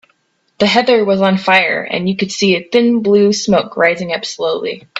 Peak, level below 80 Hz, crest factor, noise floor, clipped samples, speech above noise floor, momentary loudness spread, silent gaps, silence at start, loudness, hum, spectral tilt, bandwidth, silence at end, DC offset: 0 dBFS; -54 dBFS; 14 dB; -60 dBFS; under 0.1%; 47 dB; 7 LU; none; 0.6 s; -13 LUFS; none; -4.5 dB/octave; 8 kHz; 0 s; under 0.1%